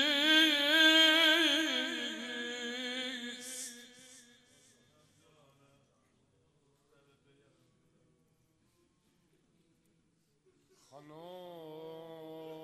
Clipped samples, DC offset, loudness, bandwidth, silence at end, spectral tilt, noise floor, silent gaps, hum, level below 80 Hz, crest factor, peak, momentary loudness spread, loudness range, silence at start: under 0.1%; under 0.1%; -27 LUFS; 15.5 kHz; 0 s; -0.5 dB/octave; -74 dBFS; none; none; -86 dBFS; 22 dB; -14 dBFS; 26 LU; 26 LU; 0 s